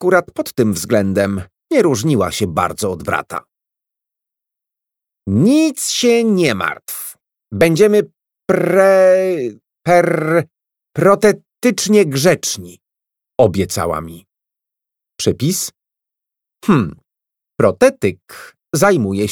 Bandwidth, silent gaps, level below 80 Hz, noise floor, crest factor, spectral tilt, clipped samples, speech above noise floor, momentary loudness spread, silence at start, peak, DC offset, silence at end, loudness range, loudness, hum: 18.5 kHz; none; -50 dBFS; -84 dBFS; 16 dB; -5 dB/octave; under 0.1%; 70 dB; 14 LU; 0 s; 0 dBFS; under 0.1%; 0 s; 7 LU; -15 LUFS; none